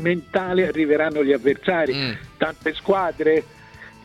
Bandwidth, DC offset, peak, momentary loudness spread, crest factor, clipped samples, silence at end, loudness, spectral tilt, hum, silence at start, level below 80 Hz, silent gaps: 11.5 kHz; under 0.1%; -6 dBFS; 6 LU; 16 dB; under 0.1%; 0.15 s; -21 LUFS; -7 dB/octave; none; 0 s; -52 dBFS; none